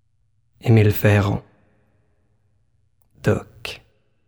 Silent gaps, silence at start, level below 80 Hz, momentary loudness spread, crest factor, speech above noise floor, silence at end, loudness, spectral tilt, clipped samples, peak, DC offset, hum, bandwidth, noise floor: none; 0.65 s; -48 dBFS; 17 LU; 18 dB; 50 dB; 0.5 s; -19 LUFS; -7.5 dB/octave; under 0.1%; -4 dBFS; under 0.1%; 60 Hz at -55 dBFS; over 20 kHz; -67 dBFS